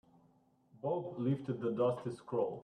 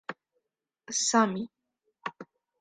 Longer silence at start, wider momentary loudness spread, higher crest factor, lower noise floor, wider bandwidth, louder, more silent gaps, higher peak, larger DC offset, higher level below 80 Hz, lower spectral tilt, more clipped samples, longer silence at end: first, 0.75 s vs 0.1 s; second, 6 LU vs 18 LU; about the same, 16 dB vs 20 dB; second, -70 dBFS vs -83 dBFS; about the same, 10 kHz vs 9.6 kHz; second, -37 LUFS vs -27 LUFS; neither; second, -22 dBFS vs -12 dBFS; neither; about the same, -76 dBFS vs -78 dBFS; first, -9 dB/octave vs -2.5 dB/octave; neither; second, 0 s vs 0.35 s